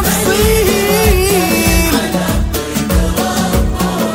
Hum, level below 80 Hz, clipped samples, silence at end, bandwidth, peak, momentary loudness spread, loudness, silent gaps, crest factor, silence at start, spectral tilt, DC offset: none; -20 dBFS; under 0.1%; 0 s; 16.5 kHz; 0 dBFS; 5 LU; -13 LUFS; none; 12 dB; 0 s; -4.5 dB/octave; under 0.1%